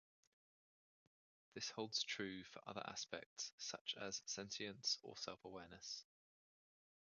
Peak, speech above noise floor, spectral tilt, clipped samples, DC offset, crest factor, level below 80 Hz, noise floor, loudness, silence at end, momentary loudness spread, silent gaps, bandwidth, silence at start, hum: -28 dBFS; over 40 dB; -1.5 dB/octave; under 0.1%; under 0.1%; 24 dB; -84 dBFS; under -90 dBFS; -48 LUFS; 1.1 s; 10 LU; 3.26-3.36 s, 3.53-3.58 s, 3.81-3.85 s; 10 kHz; 1.55 s; none